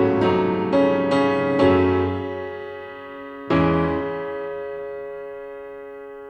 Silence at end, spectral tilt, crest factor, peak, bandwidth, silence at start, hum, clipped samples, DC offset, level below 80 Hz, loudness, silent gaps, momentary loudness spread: 0 s; -8 dB/octave; 18 dB; -4 dBFS; 8.6 kHz; 0 s; none; under 0.1%; under 0.1%; -48 dBFS; -21 LUFS; none; 17 LU